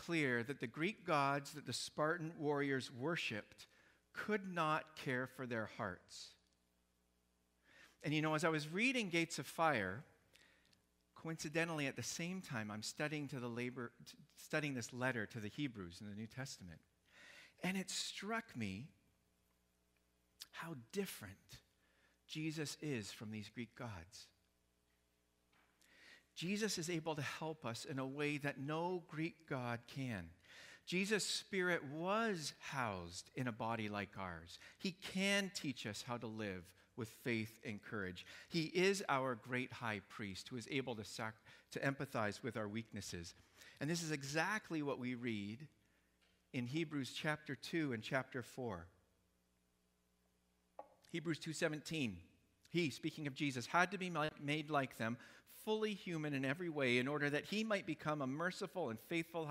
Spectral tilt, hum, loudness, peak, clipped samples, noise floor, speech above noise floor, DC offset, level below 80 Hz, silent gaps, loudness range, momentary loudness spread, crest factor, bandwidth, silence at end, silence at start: -4.5 dB/octave; none; -42 LUFS; -18 dBFS; under 0.1%; -81 dBFS; 38 dB; under 0.1%; -78 dBFS; none; 8 LU; 15 LU; 26 dB; 16 kHz; 0 s; 0 s